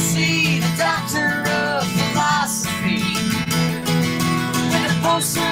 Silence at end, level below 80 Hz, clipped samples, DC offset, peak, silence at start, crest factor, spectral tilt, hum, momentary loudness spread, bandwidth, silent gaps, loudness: 0 s; -48 dBFS; under 0.1%; under 0.1%; -6 dBFS; 0 s; 14 dB; -4 dB/octave; none; 3 LU; 16.5 kHz; none; -19 LUFS